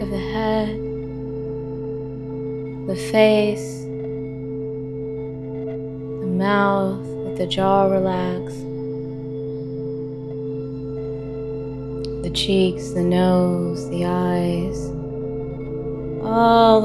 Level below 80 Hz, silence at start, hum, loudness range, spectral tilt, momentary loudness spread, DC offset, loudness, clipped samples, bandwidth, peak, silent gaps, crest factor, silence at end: -42 dBFS; 0 s; none; 7 LU; -6.5 dB/octave; 13 LU; under 0.1%; -23 LUFS; under 0.1%; 12.5 kHz; 0 dBFS; none; 20 dB; 0 s